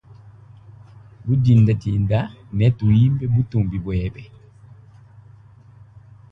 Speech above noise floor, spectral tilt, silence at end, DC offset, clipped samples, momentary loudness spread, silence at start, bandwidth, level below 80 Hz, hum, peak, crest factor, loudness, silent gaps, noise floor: 29 dB; -10 dB/octave; 2.05 s; under 0.1%; under 0.1%; 12 LU; 0.7 s; 5.8 kHz; -40 dBFS; none; -4 dBFS; 16 dB; -19 LUFS; none; -46 dBFS